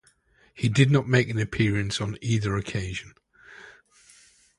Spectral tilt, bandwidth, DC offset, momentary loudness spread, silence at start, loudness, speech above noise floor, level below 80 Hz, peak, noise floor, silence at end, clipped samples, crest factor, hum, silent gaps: -6 dB/octave; 11.5 kHz; under 0.1%; 14 LU; 0.55 s; -25 LUFS; 38 dB; -48 dBFS; -4 dBFS; -62 dBFS; 0.85 s; under 0.1%; 22 dB; none; none